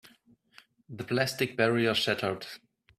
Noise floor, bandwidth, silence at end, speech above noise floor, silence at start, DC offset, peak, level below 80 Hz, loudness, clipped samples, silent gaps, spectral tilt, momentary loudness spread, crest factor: -63 dBFS; 16 kHz; 0.4 s; 34 dB; 0.9 s; under 0.1%; -10 dBFS; -68 dBFS; -28 LUFS; under 0.1%; none; -4.5 dB/octave; 18 LU; 22 dB